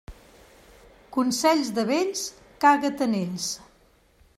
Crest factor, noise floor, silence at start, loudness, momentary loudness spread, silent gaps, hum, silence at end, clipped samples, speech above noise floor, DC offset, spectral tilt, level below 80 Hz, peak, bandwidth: 20 dB; -60 dBFS; 0.1 s; -24 LUFS; 11 LU; none; none; 0.8 s; under 0.1%; 36 dB; under 0.1%; -3.5 dB/octave; -56 dBFS; -6 dBFS; 15.5 kHz